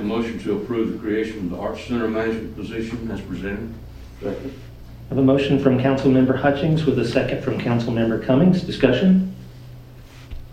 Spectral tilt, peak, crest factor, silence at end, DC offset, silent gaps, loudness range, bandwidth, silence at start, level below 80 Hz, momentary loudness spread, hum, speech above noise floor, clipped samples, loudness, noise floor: -8 dB/octave; -2 dBFS; 20 dB; 0 s; under 0.1%; none; 8 LU; 14.5 kHz; 0 s; -42 dBFS; 22 LU; none; 21 dB; under 0.1%; -21 LUFS; -41 dBFS